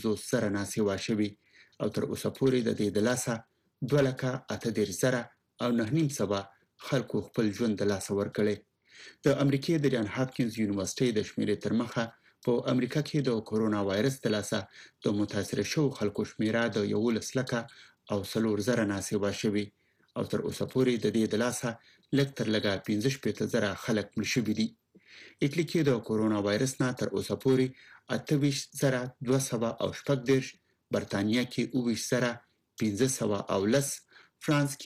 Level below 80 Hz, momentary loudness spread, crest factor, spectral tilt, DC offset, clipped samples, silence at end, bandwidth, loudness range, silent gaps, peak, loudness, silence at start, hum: -66 dBFS; 7 LU; 16 dB; -5.5 dB/octave; under 0.1%; under 0.1%; 0 s; 15.5 kHz; 1 LU; none; -14 dBFS; -30 LUFS; 0 s; none